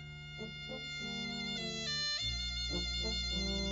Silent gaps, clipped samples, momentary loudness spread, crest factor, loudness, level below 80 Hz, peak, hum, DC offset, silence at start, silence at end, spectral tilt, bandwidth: none; under 0.1%; 10 LU; 14 dB; -37 LUFS; -46 dBFS; -26 dBFS; none; under 0.1%; 0 s; 0 s; -2 dB/octave; 7.6 kHz